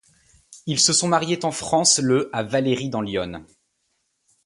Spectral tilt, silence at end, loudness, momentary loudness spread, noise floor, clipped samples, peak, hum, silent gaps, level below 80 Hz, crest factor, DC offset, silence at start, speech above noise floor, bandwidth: -3 dB/octave; 1 s; -20 LUFS; 12 LU; -72 dBFS; under 0.1%; -4 dBFS; none; none; -56 dBFS; 20 dB; under 0.1%; 0.5 s; 51 dB; 11.5 kHz